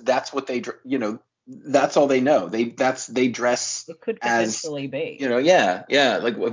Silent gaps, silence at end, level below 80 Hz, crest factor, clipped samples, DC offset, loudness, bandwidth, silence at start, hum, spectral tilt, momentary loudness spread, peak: none; 0 s; -70 dBFS; 18 dB; under 0.1%; under 0.1%; -22 LUFS; 7.6 kHz; 0 s; none; -3.5 dB/octave; 11 LU; -4 dBFS